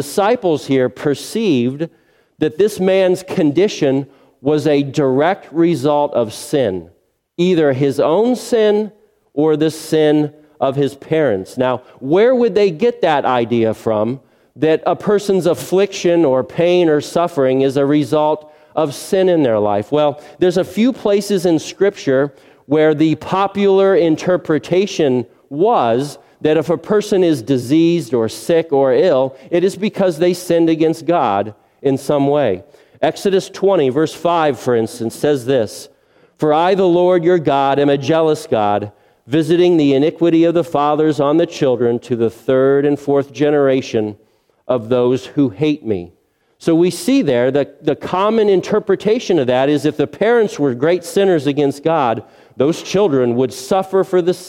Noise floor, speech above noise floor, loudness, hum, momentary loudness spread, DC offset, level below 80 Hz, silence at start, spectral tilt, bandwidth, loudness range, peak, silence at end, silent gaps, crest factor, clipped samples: -51 dBFS; 36 dB; -15 LUFS; none; 7 LU; under 0.1%; -56 dBFS; 0 s; -6 dB/octave; 16 kHz; 2 LU; 0 dBFS; 0 s; none; 14 dB; under 0.1%